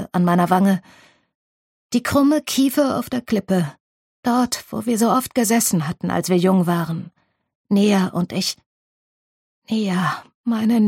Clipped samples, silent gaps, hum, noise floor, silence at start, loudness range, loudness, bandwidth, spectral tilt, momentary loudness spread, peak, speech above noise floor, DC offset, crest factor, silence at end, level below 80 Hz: under 0.1%; 1.35-1.90 s, 3.80-4.23 s, 7.55-7.65 s, 8.66-9.62 s, 10.34-10.44 s; none; under -90 dBFS; 0 s; 3 LU; -20 LUFS; 16.5 kHz; -5.5 dB/octave; 8 LU; -2 dBFS; over 72 dB; under 0.1%; 18 dB; 0 s; -58 dBFS